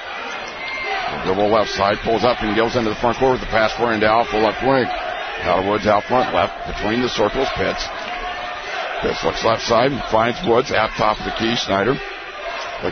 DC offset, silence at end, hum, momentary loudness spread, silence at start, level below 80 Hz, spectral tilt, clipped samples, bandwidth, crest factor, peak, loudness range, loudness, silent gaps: under 0.1%; 0 s; none; 9 LU; 0 s; -40 dBFS; -4.5 dB/octave; under 0.1%; 6.6 kHz; 18 dB; -2 dBFS; 3 LU; -19 LUFS; none